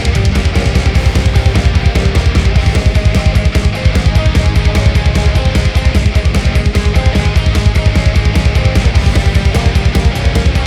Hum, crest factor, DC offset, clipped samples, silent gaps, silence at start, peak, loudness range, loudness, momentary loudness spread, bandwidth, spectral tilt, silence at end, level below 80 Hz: none; 10 dB; under 0.1%; under 0.1%; none; 0 s; 0 dBFS; 0 LU; -12 LUFS; 1 LU; 12.5 kHz; -6 dB/octave; 0 s; -12 dBFS